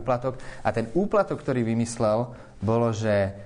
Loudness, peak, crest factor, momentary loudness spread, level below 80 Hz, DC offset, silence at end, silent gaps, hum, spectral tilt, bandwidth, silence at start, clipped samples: -26 LUFS; -8 dBFS; 16 dB; 6 LU; -50 dBFS; under 0.1%; 0 s; none; none; -7 dB/octave; 10 kHz; 0 s; under 0.1%